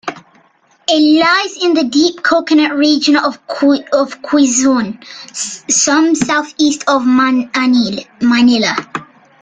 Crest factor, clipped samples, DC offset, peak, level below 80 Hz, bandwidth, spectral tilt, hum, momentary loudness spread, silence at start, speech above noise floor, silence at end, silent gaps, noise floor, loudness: 12 dB; under 0.1%; under 0.1%; 0 dBFS; -56 dBFS; 9.6 kHz; -2.5 dB/octave; none; 11 LU; 0.05 s; 39 dB; 0.35 s; none; -52 dBFS; -12 LUFS